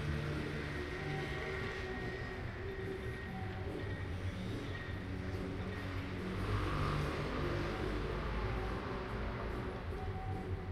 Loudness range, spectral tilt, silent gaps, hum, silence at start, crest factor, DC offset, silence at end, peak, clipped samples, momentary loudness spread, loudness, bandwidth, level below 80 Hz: 4 LU; -7 dB/octave; none; none; 0 s; 14 dB; under 0.1%; 0 s; -24 dBFS; under 0.1%; 5 LU; -41 LUFS; 14 kHz; -46 dBFS